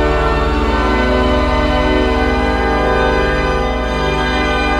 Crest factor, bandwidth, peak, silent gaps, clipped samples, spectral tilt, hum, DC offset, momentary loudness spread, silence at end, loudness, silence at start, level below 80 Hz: 12 dB; 10.5 kHz; -2 dBFS; none; under 0.1%; -6 dB/octave; none; under 0.1%; 2 LU; 0 s; -15 LUFS; 0 s; -20 dBFS